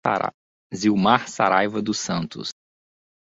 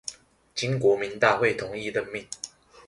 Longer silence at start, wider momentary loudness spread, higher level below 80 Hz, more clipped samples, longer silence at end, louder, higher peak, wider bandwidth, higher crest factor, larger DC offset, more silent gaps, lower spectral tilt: about the same, 0.05 s vs 0.05 s; second, 13 LU vs 16 LU; about the same, -60 dBFS vs -62 dBFS; neither; first, 0.8 s vs 0.05 s; first, -22 LUFS vs -26 LUFS; first, -2 dBFS vs -6 dBFS; second, 8 kHz vs 11.5 kHz; about the same, 20 dB vs 22 dB; neither; first, 0.34-0.70 s vs none; about the same, -4.5 dB/octave vs -4.5 dB/octave